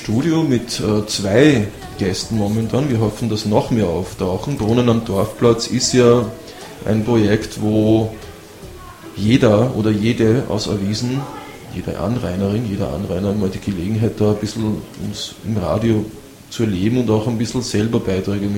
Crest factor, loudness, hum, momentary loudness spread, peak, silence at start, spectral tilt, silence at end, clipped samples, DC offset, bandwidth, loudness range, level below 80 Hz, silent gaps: 18 dB; -18 LUFS; none; 13 LU; 0 dBFS; 0 s; -6 dB/octave; 0 s; under 0.1%; under 0.1%; 16.5 kHz; 4 LU; -40 dBFS; none